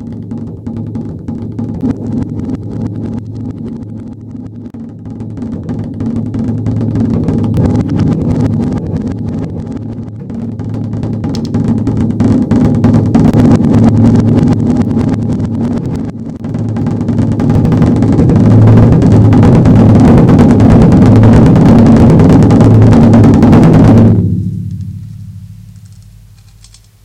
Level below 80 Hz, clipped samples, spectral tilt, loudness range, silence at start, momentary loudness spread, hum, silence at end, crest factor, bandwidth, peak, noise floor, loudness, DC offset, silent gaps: -24 dBFS; 3%; -9.5 dB/octave; 14 LU; 0 s; 18 LU; none; 1.15 s; 8 dB; 9 kHz; 0 dBFS; -39 dBFS; -8 LUFS; under 0.1%; none